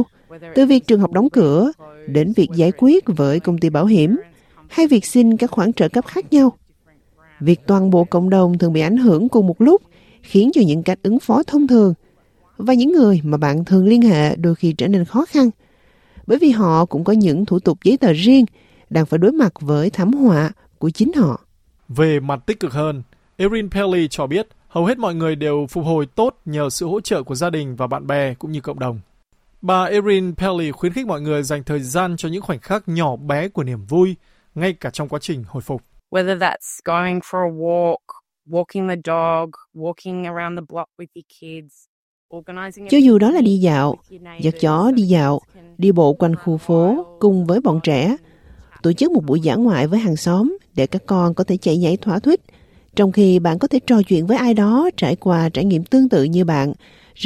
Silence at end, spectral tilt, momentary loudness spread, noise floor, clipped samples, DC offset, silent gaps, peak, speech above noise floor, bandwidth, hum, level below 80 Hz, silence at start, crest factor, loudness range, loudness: 0 s; -7 dB/octave; 12 LU; -56 dBFS; under 0.1%; under 0.1%; 41.88-42.29 s; -2 dBFS; 40 dB; 14.5 kHz; none; -50 dBFS; 0 s; 16 dB; 7 LU; -17 LUFS